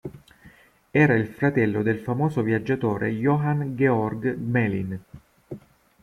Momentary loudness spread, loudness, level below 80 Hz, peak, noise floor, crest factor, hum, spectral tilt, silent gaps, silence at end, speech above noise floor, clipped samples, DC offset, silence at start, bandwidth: 18 LU; -23 LUFS; -56 dBFS; -6 dBFS; -53 dBFS; 18 dB; none; -9 dB/octave; none; 0.45 s; 30 dB; under 0.1%; under 0.1%; 0.05 s; 13 kHz